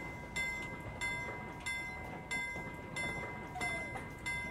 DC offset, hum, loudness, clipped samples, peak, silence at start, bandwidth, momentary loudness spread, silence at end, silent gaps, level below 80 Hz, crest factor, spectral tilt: under 0.1%; none; -40 LUFS; under 0.1%; -26 dBFS; 0 s; 16 kHz; 5 LU; 0 s; none; -56 dBFS; 16 dB; -3.5 dB/octave